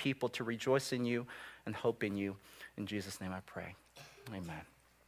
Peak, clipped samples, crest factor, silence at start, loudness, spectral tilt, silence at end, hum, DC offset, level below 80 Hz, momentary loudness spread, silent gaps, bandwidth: -20 dBFS; under 0.1%; 20 dB; 0 s; -39 LUFS; -5 dB/octave; 0.4 s; none; under 0.1%; -66 dBFS; 17 LU; none; 16 kHz